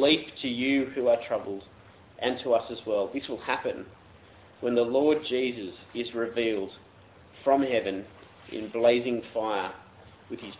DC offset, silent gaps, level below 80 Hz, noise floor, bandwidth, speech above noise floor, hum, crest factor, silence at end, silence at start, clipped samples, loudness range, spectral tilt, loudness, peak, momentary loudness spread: under 0.1%; none; -62 dBFS; -54 dBFS; 4 kHz; 26 dB; none; 20 dB; 0 s; 0 s; under 0.1%; 2 LU; -8.5 dB/octave; -28 LUFS; -8 dBFS; 15 LU